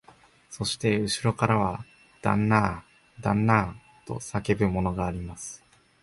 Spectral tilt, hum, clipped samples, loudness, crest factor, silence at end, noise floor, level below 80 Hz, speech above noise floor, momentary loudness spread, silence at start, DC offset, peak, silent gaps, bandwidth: -5.5 dB/octave; none; under 0.1%; -26 LUFS; 22 dB; 0.45 s; -56 dBFS; -46 dBFS; 30 dB; 17 LU; 0.5 s; under 0.1%; -6 dBFS; none; 11.5 kHz